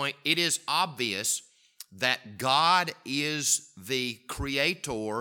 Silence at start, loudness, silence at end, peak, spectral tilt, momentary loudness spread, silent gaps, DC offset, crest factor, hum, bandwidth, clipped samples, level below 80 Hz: 0 s; -27 LUFS; 0 s; -8 dBFS; -2 dB/octave; 9 LU; none; under 0.1%; 22 dB; none; 19 kHz; under 0.1%; -54 dBFS